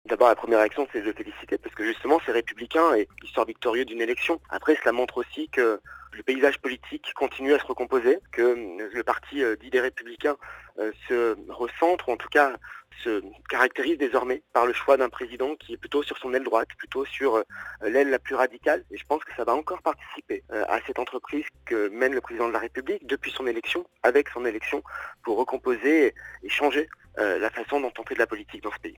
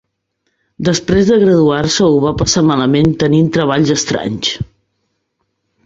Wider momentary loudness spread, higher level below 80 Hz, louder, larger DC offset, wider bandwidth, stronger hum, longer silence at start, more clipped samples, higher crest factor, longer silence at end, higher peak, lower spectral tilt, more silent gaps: first, 11 LU vs 8 LU; second, -58 dBFS vs -38 dBFS; second, -26 LUFS vs -12 LUFS; neither; first, 19 kHz vs 8 kHz; neither; second, 0.05 s vs 0.8 s; neither; first, 22 dB vs 12 dB; second, 0.05 s vs 1.25 s; second, -4 dBFS vs 0 dBFS; about the same, -4 dB/octave vs -5 dB/octave; neither